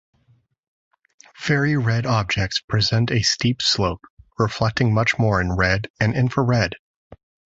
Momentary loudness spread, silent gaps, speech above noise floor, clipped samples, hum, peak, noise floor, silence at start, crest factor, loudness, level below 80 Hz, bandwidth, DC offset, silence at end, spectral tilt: 6 LU; 2.64-2.68 s, 4.10-4.17 s, 5.90-5.94 s, 6.79-7.10 s; 41 dB; under 0.1%; none; -4 dBFS; -61 dBFS; 1.4 s; 18 dB; -20 LUFS; -40 dBFS; 8 kHz; under 0.1%; 0.45 s; -5 dB/octave